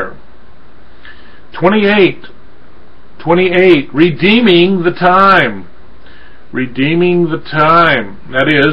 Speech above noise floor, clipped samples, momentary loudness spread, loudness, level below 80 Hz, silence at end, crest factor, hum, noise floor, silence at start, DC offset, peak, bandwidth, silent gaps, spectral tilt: 32 dB; under 0.1%; 13 LU; -10 LUFS; -44 dBFS; 0 s; 12 dB; none; -42 dBFS; 0 s; 6%; 0 dBFS; 5.6 kHz; none; -8 dB/octave